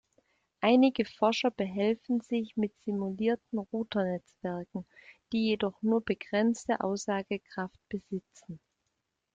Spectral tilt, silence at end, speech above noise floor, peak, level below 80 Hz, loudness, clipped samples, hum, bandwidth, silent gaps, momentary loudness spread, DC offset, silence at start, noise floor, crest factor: -5.5 dB/octave; 0.8 s; 51 dB; -12 dBFS; -70 dBFS; -31 LUFS; under 0.1%; none; 7.8 kHz; none; 13 LU; under 0.1%; 0.6 s; -82 dBFS; 20 dB